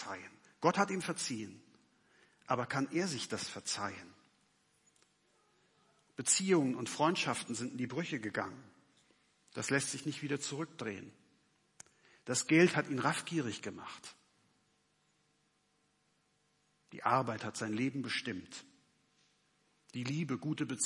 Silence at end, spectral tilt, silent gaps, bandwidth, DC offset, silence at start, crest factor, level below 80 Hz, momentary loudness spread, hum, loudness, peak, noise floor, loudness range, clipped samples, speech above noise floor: 0 s; -4 dB/octave; none; 11.5 kHz; under 0.1%; 0 s; 24 dB; -84 dBFS; 18 LU; 50 Hz at -70 dBFS; -35 LUFS; -14 dBFS; -76 dBFS; 7 LU; under 0.1%; 41 dB